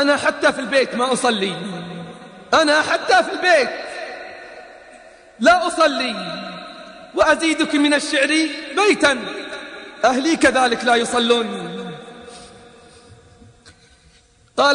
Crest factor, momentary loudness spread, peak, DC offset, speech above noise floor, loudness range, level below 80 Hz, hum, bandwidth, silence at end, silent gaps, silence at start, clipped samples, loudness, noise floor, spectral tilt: 18 dB; 19 LU; 0 dBFS; under 0.1%; 36 dB; 4 LU; -54 dBFS; none; 10.5 kHz; 0 s; none; 0 s; under 0.1%; -17 LUFS; -53 dBFS; -3 dB/octave